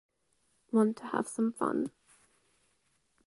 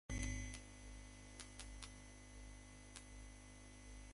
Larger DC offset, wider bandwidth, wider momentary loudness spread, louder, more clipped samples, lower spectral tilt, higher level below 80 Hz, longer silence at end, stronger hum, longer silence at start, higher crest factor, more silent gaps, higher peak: neither; about the same, 11.5 kHz vs 11.5 kHz; second, 7 LU vs 12 LU; first, -32 LUFS vs -54 LUFS; neither; first, -6.5 dB/octave vs -3.5 dB/octave; second, -76 dBFS vs -56 dBFS; first, 1.4 s vs 0 s; second, none vs 50 Hz at -60 dBFS; first, 0.75 s vs 0.1 s; about the same, 20 dB vs 24 dB; neither; first, -16 dBFS vs -28 dBFS